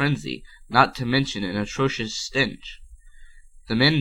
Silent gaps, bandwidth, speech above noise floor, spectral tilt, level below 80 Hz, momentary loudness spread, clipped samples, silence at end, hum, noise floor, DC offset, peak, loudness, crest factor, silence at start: none; 13 kHz; 22 dB; -5 dB/octave; -46 dBFS; 15 LU; under 0.1%; 0 s; none; -45 dBFS; under 0.1%; -2 dBFS; -23 LUFS; 22 dB; 0 s